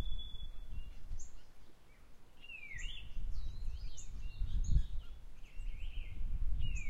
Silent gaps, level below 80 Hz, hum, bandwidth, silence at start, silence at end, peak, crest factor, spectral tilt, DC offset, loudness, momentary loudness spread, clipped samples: none; -40 dBFS; none; 8 kHz; 0 s; 0 s; -18 dBFS; 18 dB; -4 dB/octave; under 0.1%; -46 LUFS; 25 LU; under 0.1%